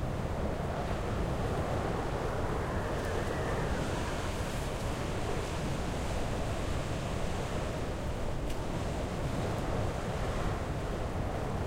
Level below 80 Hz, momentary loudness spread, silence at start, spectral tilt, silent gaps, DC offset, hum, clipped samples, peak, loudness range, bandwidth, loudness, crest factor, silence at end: -38 dBFS; 3 LU; 0 s; -6 dB/octave; none; under 0.1%; none; under 0.1%; -20 dBFS; 2 LU; 16 kHz; -35 LUFS; 12 dB; 0 s